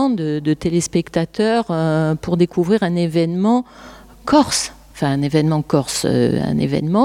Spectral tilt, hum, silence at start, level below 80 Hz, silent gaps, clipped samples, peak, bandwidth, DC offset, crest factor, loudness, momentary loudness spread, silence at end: -5.5 dB/octave; none; 0 s; -46 dBFS; none; under 0.1%; -2 dBFS; 15.5 kHz; under 0.1%; 16 dB; -18 LUFS; 4 LU; 0 s